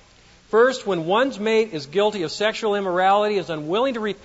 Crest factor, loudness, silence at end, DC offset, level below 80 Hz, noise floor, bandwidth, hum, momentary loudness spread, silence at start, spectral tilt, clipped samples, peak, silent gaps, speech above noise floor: 16 dB; -21 LUFS; 0.1 s; under 0.1%; -60 dBFS; -52 dBFS; 8 kHz; none; 6 LU; 0.5 s; -4.5 dB/octave; under 0.1%; -6 dBFS; none; 31 dB